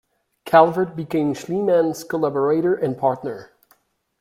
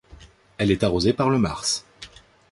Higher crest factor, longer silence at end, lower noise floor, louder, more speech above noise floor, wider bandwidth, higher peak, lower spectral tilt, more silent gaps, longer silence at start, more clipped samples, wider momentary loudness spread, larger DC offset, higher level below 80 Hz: about the same, 20 dB vs 18 dB; first, 0.75 s vs 0.45 s; first, -61 dBFS vs -49 dBFS; about the same, -20 LUFS vs -22 LUFS; first, 42 dB vs 27 dB; first, 16 kHz vs 11.5 kHz; first, -2 dBFS vs -6 dBFS; first, -6.5 dB/octave vs -5 dB/octave; neither; first, 0.45 s vs 0.1 s; neither; second, 9 LU vs 22 LU; neither; second, -62 dBFS vs -44 dBFS